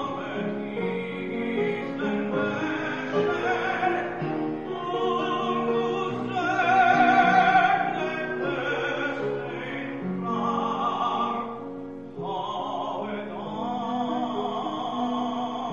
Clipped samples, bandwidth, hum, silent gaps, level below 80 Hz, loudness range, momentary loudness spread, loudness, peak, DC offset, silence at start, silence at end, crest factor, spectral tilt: under 0.1%; 7.2 kHz; none; none; -62 dBFS; 8 LU; 12 LU; -26 LUFS; -8 dBFS; 0.2%; 0 s; 0 s; 18 dB; -6 dB/octave